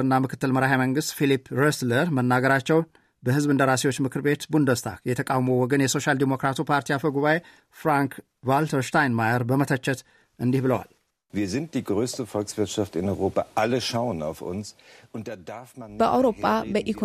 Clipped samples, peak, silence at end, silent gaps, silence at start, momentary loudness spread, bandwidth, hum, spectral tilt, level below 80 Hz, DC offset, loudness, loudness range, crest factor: under 0.1%; -8 dBFS; 0 s; none; 0 s; 12 LU; 15 kHz; none; -5.5 dB/octave; -60 dBFS; under 0.1%; -24 LUFS; 5 LU; 16 dB